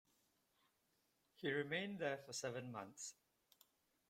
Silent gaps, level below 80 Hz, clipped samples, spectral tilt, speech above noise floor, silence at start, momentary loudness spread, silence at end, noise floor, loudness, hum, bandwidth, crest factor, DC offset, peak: none; -88 dBFS; under 0.1%; -3.5 dB/octave; 37 dB; 1.4 s; 10 LU; 0.95 s; -83 dBFS; -46 LUFS; none; 16.5 kHz; 22 dB; under 0.1%; -28 dBFS